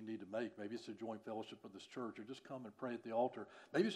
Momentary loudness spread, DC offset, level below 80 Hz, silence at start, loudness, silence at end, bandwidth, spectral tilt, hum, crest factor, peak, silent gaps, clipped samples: 12 LU; under 0.1%; under -90 dBFS; 0 s; -46 LUFS; 0 s; 11.5 kHz; -6 dB/octave; none; 20 dB; -24 dBFS; none; under 0.1%